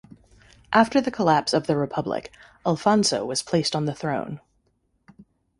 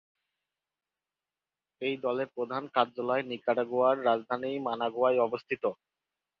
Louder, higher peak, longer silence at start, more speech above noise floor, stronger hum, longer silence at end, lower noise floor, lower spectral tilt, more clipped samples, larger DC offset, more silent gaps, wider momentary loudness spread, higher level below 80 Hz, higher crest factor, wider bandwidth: first, -23 LUFS vs -30 LUFS; first, -2 dBFS vs -10 dBFS; second, 0.7 s vs 1.8 s; second, 46 dB vs over 60 dB; neither; second, 0.35 s vs 0.65 s; second, -69 dBFS vs under -90 dBFS; second, -4.5 dB/octave vs -7.5 dB/octave; neither; neither; neither; first, 10 LU vs 7 LU; first, -58 dBFS vs -80 dBFS; about the same, 22 dB vs 22 dB; first, 11.5 kHz vs 5.6 kHz